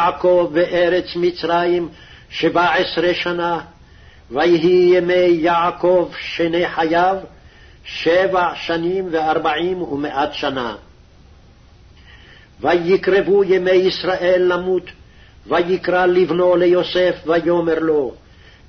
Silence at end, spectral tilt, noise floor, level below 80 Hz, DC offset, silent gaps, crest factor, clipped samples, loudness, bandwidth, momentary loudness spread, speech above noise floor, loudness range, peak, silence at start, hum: 0.5 s; -6.5 dB/octave; -46 dBFS; -48 dBFS; under 0.1%; none; 12 dB; under 0.1%; -17 LUFS; 6.4 kHz; 8 LU; 30 dB; 5 LU; -4 dBFS; 0 s; none